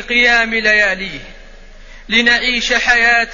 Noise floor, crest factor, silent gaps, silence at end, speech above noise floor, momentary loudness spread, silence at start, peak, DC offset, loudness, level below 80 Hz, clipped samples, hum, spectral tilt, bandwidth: -36 dBFS; 14 dB; none; 0 s; 22 dB; 10 LU; 0 s; 0 dBFS; 0.3%; -12 LUFS; -36 dBFS; under 0.1%; none; -1.5 dB/octave; 7.4 kHz